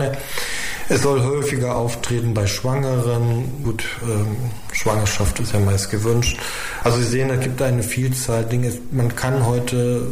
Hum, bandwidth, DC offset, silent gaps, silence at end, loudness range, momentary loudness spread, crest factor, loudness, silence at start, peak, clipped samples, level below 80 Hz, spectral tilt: none; 15.5 kHz; under 0.1%; none; 0 s; 1 LU; 6 LU; 14 dB; -21 LUFS; 0 s; -6 dBFS; under 0.1%; -36 dBFS; -5 dB/octave